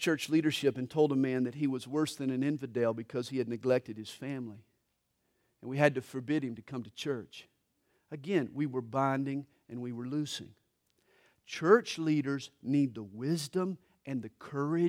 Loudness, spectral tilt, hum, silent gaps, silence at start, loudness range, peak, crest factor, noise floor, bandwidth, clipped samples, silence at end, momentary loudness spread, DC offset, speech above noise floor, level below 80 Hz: -33 LUFS; -6 dB/octave; none; none; 0 s; 4 LU; -10 dBFS; 22 dB; -79 dBFS; 16 kHz; under 0.1%; 0 s; 13 LU; under 0.1%; 47 dB; -78 dBFS